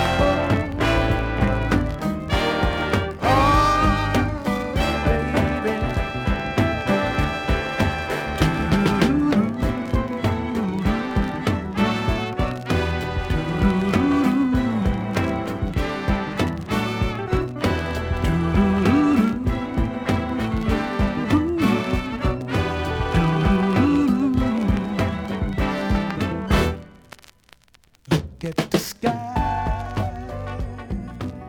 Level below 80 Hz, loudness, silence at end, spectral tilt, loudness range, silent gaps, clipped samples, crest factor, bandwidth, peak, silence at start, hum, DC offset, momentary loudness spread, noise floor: -30 dBFS; -22 LUFS; 0 s; -6.5 dB/octave; 5 LU; none; under 0.1%; 16 dB; 19 kHz; -4 dBFS; 0 s; none; under 0.1%; 7 LU; -56 dBFS